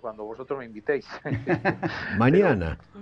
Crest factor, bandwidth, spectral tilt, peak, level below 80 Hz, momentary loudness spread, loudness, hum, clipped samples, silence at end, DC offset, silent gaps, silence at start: 18 dB; 7.2 kHz; -8.5 dB/octave; -8 dBFS; -46 dBFS; 14 LU; -25 LUFS; none; under 0.1%; 0 s; under 0.1%; none; 0.05 s